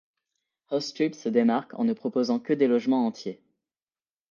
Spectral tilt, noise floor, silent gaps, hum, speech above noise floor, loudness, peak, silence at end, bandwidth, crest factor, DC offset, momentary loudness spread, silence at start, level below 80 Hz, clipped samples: -6 dB/octave; under -90 dBFS; none; none; over 65 dB; -26 LUFS; -10 dBFS; 0.95 s; 7.2 kHz; 18 dB; under 0.1%; 8 LU; 0.7 s; -78 dBFS; under 0.1%